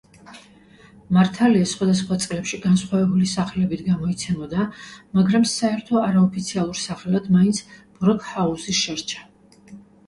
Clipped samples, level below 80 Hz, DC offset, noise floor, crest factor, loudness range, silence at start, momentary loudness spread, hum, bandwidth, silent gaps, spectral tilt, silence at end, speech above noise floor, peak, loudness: under 0.1%; -52 dBFS; under 0.1%; -49 dBFS; 16 dB; 2 LU; 0.3 s; 8 LU; none; 11.5 kHz; none; -5.5 dB/octave; 0.25 s; 29 dB; -6 dBFS; -21 LUFS